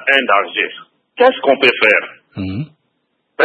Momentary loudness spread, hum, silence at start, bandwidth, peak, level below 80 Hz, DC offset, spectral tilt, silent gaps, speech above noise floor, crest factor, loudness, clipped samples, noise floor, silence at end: 18 LU; none; 0 s; 11 kHz; 0 dBFS; -62 dBFS; under 0.1%; -5.5 dB/octave; none; 53 dB; 16 dB; -14 LUFS; under 0.1%; -67 dBFS; 0 s